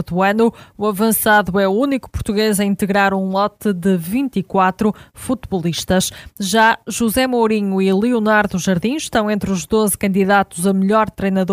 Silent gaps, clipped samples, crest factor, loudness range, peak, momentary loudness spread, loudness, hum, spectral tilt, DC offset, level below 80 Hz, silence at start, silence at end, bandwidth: none; under 0.1%; 16 dB; 2 LU; 0 dBFS; 7 LU; -17 LUFS; none; -5 dB/octave; under 0.1%; -42 dBFS; 0 s; 0 s; 16 kHz